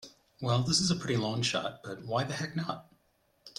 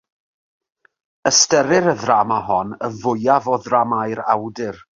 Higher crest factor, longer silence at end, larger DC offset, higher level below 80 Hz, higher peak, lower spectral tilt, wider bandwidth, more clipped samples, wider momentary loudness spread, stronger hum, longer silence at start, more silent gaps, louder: about the same, 18 dB vs 18 dB; about the same, 0.1 s vs 0.2 s; neither; about the same, -62 dBFS vs -58 dBFS; second, -14 dBFS vs 0 dBFS; about the same, -4 dB/octave vs -3 dB/octave; first, 13 kHz vs 7.6 kHz; neither; about the same, 12 LU vs 10 LU; neither; second, 0 s vs 1.25 s; neither; second, -31 LUFS vs -17 LUFS